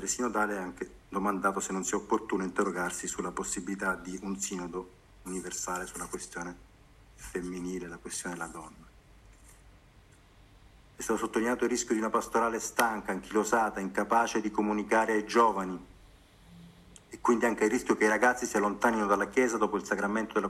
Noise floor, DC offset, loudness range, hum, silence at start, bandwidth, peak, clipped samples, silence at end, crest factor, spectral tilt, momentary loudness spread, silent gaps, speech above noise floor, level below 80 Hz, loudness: -58 dBFS; under 0.1%; 13 LU; none; 0 s; 15.5 kHz; -8 dBFS; under 0.1%; 0 s; 24 dB; -4 dB/octave; 13 LU; none; 28 dB; -58 dBFS; -30 LUFS